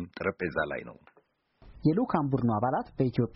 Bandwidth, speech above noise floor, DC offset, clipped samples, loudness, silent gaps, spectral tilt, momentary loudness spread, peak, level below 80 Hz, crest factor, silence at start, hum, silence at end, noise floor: 5.8 kHz; 39 dB; under 0.1%; under 0.1%; -30 LUFS; none; -7.5 dB/octave; 7 LU; -12 dBFS; -56 dBFS; 18 dB; 0 s; none; 0.05 s; -67 dBFS